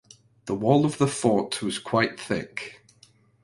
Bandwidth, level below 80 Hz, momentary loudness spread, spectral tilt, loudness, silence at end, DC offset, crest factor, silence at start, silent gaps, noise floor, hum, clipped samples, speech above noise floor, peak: 11.5 kHz; -60 dBFS; 15 LU; -5.5 dB/octave; -25 LUFS; 0.7 s; under 0.1%; 20 dB; 0.45 s; none; -58 dBFS; none; under 0.1%; 34 dB; -6 dBFS